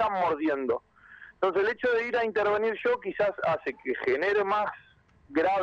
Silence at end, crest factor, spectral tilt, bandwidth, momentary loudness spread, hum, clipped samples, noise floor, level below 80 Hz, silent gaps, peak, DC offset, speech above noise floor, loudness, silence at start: 0 s; 14 dB; -6 dB/octave; 7.6 kHz; 6 LU; none; under 0.1%; -52 dBFS; -64 dBFS; none; -14 dBFS; under 0.1%; 25 dB; -28 LUFS; 0 s